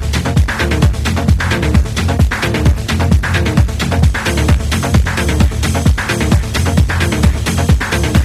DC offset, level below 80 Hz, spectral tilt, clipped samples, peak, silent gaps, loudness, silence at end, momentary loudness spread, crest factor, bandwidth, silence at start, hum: under 0.1%; -16 dBFS; -5.5 dB/octave; under 0.1%; 0 dBFS; none; -14 LUFS; 0 s; 2 LU; 12 dB; 15 kHz; 0 s; none